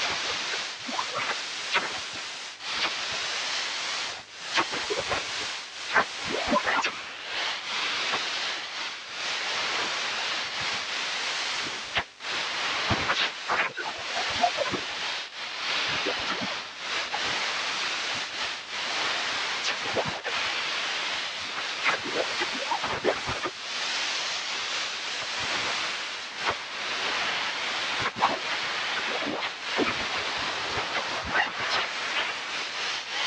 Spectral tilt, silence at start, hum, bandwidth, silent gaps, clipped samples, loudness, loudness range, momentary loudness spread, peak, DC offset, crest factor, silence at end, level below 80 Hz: -1 dB/octave; 0 s; none; 11.5 kHz; none; under 0.1%; -28 LUFS; 1 LU; 5 LU; -6 dBFS; under 0.1%; 24 dB; 0 s; -62 dBFS